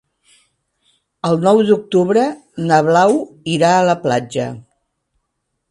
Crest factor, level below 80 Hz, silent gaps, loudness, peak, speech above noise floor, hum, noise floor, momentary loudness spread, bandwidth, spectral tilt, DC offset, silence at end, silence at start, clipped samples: 16 dB; -60 dBFS; none; -15 LUFS; 0 dBFS; 59 dB; none; -73 dBFS; 11 LU; 11.5 kHz; -6 dB/octave; under 0.1%; 1.1 s; 1.25 s; under 0.1%